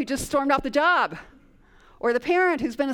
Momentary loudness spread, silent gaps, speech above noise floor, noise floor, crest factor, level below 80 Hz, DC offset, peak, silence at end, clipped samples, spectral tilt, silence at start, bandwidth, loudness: 8 LU; none; 31 dB; -54 dBFS; 16 dB; -50 dBFS; under 0.1%; -8 dBFS; 0 s; under 0.1%; -4 dB/octave; 0 s; 18 kHz; -23 LUFS